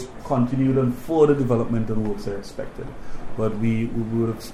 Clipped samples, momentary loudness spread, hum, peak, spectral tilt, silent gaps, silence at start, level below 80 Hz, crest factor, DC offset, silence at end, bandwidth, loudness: under 0.1%; 16 LU; none; -6 dBFS; -8.5 dB/octave; none; 0 s; -38 dBFS; 16 dB; under 0.1%; 0 s; 15 kHz; -23 LUFS